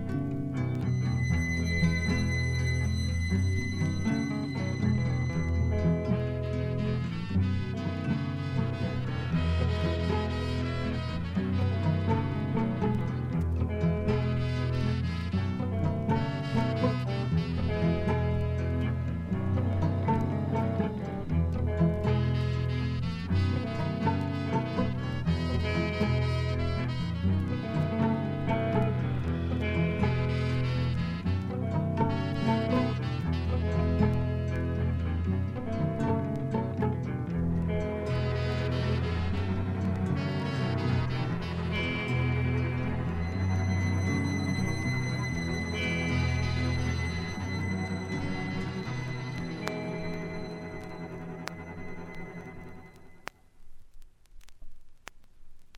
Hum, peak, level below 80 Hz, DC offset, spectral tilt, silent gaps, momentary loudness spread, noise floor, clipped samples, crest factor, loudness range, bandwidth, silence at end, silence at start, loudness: none; -12 dBFS; -42 dBFS; under 0.1%; -7.5 dB/octave; none; 5 LU; -49 dBFS; under 0.1%; 16 dB; 5 LU; 10.5 kHz; 0 s; 0 s; -30 LUFS